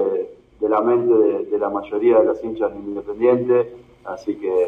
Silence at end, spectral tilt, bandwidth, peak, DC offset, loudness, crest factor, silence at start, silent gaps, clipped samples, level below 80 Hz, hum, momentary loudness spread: 0 s; -8.5 dB/octave; 6.2 kHz; -4 dBFS; under 0.1%; -20 LUFS; 16 dB; 0 s; none; under 0.1%; -56 dBFS; none; 14 LU